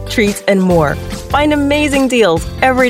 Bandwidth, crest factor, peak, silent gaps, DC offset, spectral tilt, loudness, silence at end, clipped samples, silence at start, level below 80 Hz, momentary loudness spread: 16 kHz; 12 dB; 0 dBFS; none; under 0.1%; -5 dB/octave; -13 LUFS; 0 s; under 0.1%; 0 s; -30 dBFS; 5 LU